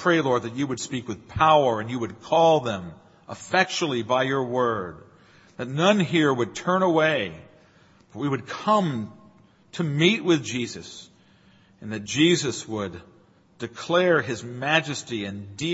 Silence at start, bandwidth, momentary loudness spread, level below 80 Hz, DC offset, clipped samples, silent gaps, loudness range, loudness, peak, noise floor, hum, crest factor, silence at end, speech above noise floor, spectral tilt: 0 s; 8 kHz; 17 LU; -60 dBFS; under 0.1%; under 0.1%; none; 4 LU; -23 LUFS; -4 dBFS; -56 dBFS; none; 22 dB; 0 s; 33 dB; -5 dB/octave